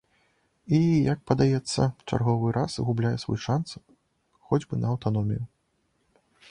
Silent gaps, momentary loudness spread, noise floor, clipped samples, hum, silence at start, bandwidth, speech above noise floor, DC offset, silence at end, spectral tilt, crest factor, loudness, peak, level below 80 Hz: none; 7 LU; -72 dBFS; under 0.1%; none; 0.65 s; 10.5 kHz; 47 dB; under 0.1%; 1.05 s; -7 dB/octave; 20 dB; -26 LUFS; -6 dBFS; -52 dBFS